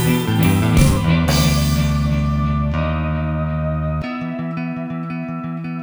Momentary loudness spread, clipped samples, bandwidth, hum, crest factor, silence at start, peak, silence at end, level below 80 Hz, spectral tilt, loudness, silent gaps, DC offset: 11 LU; under 0.1%; over 20 kHz; none; 16 dB; 0 s; -2 dBFS; 0 s; -26 dBFS; -6 dB/octave; -19 LUFS; none; under 0.1%